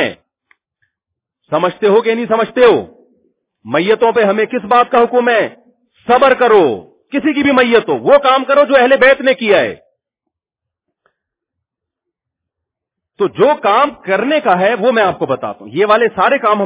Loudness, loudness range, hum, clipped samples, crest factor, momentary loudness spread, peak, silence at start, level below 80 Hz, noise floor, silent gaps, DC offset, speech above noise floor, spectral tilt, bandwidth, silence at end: -12 LUFS; 7 LU; none; 0.3%; 14 dB; 9 LU; 0 dBFS; 0 s; -54 dBFS; -82 dBFS; none; under 0.1%; 71 dB; -8.5 dB/octave; 4 kHz; 0 s